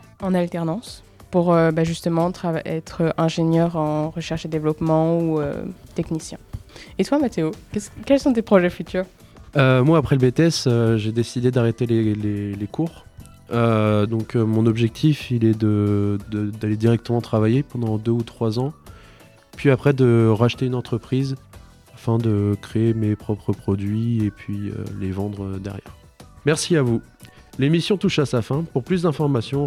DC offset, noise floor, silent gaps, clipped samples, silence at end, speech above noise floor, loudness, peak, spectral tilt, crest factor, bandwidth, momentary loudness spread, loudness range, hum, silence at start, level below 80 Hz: under 0.1%; -48 dBFS; none; under 0.1%; 0 s; 28 dB; -21 LUFS; -2 dBFS; -7 dB/octave; 20 dB; 13.5 kHz; 12 LU; 5 LU; none; 0.2 s; -48 dBFS